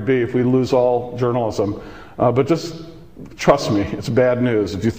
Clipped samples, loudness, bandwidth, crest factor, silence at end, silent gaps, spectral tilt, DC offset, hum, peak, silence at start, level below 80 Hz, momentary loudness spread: under 0.1%; -18 LUFS; 16 kHz; 18 dB; 0 s; none; -7 dB/octave; 0.5%; none; -2 dBFS; 0 s; -44 dBFS; 16 LU